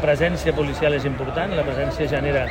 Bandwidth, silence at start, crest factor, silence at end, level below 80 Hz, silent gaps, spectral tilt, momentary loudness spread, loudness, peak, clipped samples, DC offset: 16 kHz; 0 s; 14 dB; 0 s; -34 dBFS; none; -6.5 dB/octave; 4 LU; -22 LUFS; -6 dBFS; under 0.1%; under 0.1%